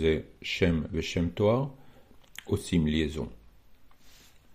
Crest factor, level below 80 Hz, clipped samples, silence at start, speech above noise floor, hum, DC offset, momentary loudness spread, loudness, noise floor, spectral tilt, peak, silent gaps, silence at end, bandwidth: 20 dB; -48 dBFS; under 0.1%; 0 s; 26 dB; none; under 0.1%; 12 LU; -29 LUFS; -54 dBFS; -6.5 dB/octave; -10 dBFS; none; 0.15 s; 15 kHz